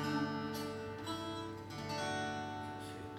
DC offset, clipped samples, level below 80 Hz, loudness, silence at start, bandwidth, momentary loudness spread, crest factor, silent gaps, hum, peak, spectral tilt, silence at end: under 0.1%; under 0.1%; -68 dBFS; -41 LUFS; 0 s; 19 kHz; 7 LU; 16 dB; none; none; -26 dBFS; -5 dB/octave; 0 s